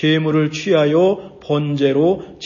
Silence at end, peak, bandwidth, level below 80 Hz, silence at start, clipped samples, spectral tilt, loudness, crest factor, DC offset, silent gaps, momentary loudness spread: 0 s; -2 dBFS; 7.2 kHz; -54 dBFS; 0 s; under 0.1%; -6.5 dB/octave; -17 LUFS; 14 dB; under 0.1%; none; 6 LU